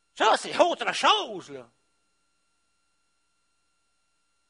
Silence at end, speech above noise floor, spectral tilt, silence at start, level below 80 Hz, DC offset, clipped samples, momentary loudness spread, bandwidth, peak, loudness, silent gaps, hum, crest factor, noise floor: 2.85 s; 50 dB; -1.5 dB/octave; 0.15 s; -80 dBFS; under 0.1%; under 0.1%; 16 LU; 10.5 kHz; -6 dBFS; -23 LUFS; none; none; 24 dB; -75 dBFS